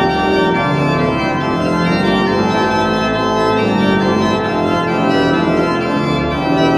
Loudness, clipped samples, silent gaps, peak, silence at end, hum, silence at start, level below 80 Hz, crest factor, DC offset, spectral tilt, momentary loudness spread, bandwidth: -14 LUFS; under 0.1%; none; -2 dBFS; 0 s; none; 0 s; -36 dBFS; 12 dB; under 0.1%; -6.5 dB/octave; 2 LU; 13 kHz